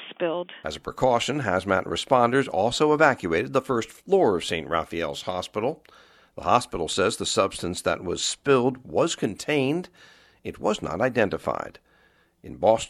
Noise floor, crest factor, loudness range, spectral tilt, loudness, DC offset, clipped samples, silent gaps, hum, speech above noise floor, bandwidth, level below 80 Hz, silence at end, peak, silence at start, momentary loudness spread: -62 dBFS; 20 dB; 4 LU; -4 dB/octave; -25 LUFS; under 0.1%; under 0.1%; none; none; 37 dB; 14.5 kHz; -54 dBFS; 0 s; -4 dBFS; 0 s; 10 LU